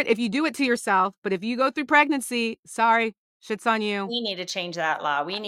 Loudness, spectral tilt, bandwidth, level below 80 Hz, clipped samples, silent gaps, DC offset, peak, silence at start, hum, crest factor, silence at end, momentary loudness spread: -24 LUFS; -3.5 dB/octave; 15.5 kHz; -74 dBFS; under 0.1%; 1.18-1.22 s, 2.59-2.63 s, 3.18-3.40 s; under 0.1%; -6 dBFS; 0 s; none; 18 dB; 0 s; 9 LU